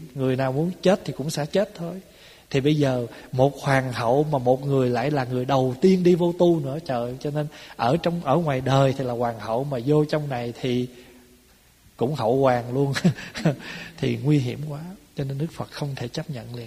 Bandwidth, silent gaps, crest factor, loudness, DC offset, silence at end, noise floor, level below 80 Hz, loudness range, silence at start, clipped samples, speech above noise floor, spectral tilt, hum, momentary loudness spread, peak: 15.5 kHz; none; 18 dB; -24 LUFS; under 0.1%; 0 s; -56 dBFS; -54 dBFS; 5 LU; 0 s; under 0.1%; 33 dB; -7 dB/octave; none; 11 LU; -4 dBFS